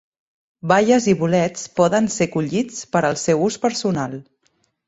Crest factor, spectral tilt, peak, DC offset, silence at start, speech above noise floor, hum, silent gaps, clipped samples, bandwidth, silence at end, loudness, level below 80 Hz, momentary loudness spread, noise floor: 18 dB; -5 dB/octave; -2 dBFS; under 0.1%; 0.65 s; 47 dB; none; none; under 0.1%; 8.4 kHz; 0.65 s; -19 LUFS; -56 dBFS; 8 LU; -66 dBFS